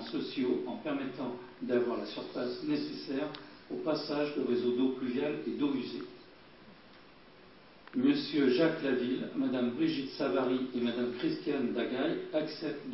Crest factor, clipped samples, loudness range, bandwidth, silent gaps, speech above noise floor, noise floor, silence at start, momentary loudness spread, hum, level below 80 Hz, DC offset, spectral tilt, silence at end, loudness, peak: 18 dB; under 0.1%; 5 LU; 6 kHz; none; 24 dB; -57 dBFS; 0 s; 9 LU; none; -74 dBFS; under 0.1%; -8.5 dB/octave; 0 s; -33 LUFS; -16 dBFS